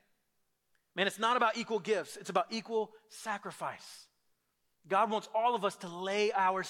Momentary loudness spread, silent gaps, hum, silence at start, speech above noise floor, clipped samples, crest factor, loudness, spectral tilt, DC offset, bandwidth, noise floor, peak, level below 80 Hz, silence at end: 13 LU; none; none; 0.95 s; 45 dB; under 0.1%; 22 dB; -33 LUFS; -3.5 dB/octave; under 0.1%; 16 kHz; -78 dBFS; -14 dBFS; -88 dBFS; 0 s